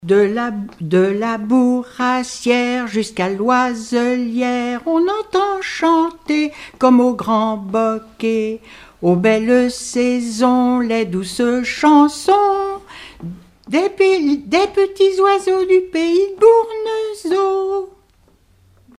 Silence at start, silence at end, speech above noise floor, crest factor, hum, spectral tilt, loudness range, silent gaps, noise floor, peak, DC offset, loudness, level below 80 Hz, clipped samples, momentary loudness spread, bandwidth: 0 s; 1.1 s; 38 dB; 16 dB; none; -5.5 dB/octave; 3 LU; none; -54 dBFS; 0 dBFS; under 0.1%; -16 LUFS; -52 dBFS; under 0.1%; 9 LU; 13 kHz